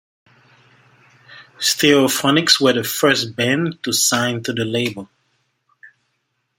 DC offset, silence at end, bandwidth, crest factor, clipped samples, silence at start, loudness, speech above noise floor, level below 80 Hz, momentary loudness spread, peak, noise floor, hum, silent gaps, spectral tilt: under 0.1%; 0.7 s; 16.5 kHz; 20 dB; under 0.1%; 1.3 s; -16 LUFS; 54 dB; -62 dBFS; 8 LU; 0 dBFS; -71 dBFS; none; none; -3 dB/octave